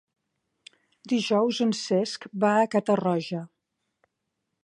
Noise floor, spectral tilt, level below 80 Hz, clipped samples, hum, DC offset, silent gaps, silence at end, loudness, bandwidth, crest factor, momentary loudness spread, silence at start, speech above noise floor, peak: -81 dBFS; -5.5 dB/octave; -76 dBFS; under 0.1%; none; under 0.1%; none; 1.2 s; -25 LUFS; 11 kHz; 18 dB; 8 LU; 1.05 s; 56 dB; -10 dBFS